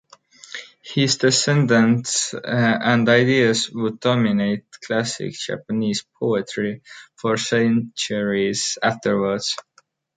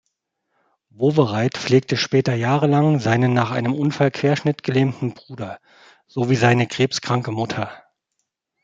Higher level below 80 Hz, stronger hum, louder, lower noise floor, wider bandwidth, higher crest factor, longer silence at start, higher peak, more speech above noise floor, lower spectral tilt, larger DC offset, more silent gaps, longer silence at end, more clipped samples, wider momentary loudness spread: about the same, -62 dBFS vs -60 dBFS; neither; about the same, -20 LUFS vs -19 LUFS; second, -47 dBFS vs -76 dBFS; first, 9.6 kHz vs 7.8 kHz; about the same, 18 dB vs 18 dB; second, 0.5 s vs 1 s; about the same, -2 dBFS vs -2 dBFS; second, 27 dB vs 57 dB; second, -4.5 dB/octave vs -6.5 dB/octave; neither; neither; second, 0.55 s vs 0.85 s; neither; about the same, 11 LU vs 13 LU